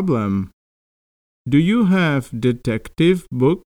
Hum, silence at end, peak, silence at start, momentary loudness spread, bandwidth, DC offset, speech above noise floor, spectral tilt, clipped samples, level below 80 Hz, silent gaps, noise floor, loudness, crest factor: none; 0.05 s; -4 dBFS; 0 s; 9 LU; 13 kHz; under 0.1%; over 73 dB; -7.5 dB/octave; under 0.1%; -46 dBFS; 0.53-1.45 s; under -90 dBFS; -18 LUFS; 16 dB